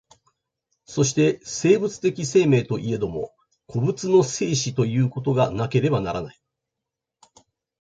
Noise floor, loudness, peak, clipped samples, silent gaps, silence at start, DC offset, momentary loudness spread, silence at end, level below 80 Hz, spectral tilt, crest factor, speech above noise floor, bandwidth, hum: -85 dBFS; -22 LUFS; -4 dBFS; under 0.1%; none; 0.9 s; under 0.1%; 11 LU; 1.5 s; -54 dBFS; -5.5 dB/octave; 18 dB; 64 dB; 9.2 kHz; none